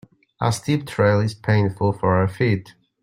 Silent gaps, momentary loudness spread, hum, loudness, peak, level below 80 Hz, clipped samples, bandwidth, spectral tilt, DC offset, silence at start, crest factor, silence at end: none; 5 LU; none; -21 LUFS; -4 dBFS; -54 dBFS; under 0.1%; 14.5 kHz; -6.5 dB/octave; under 0.1%; 0.4 s; 18 dB; 0.3 s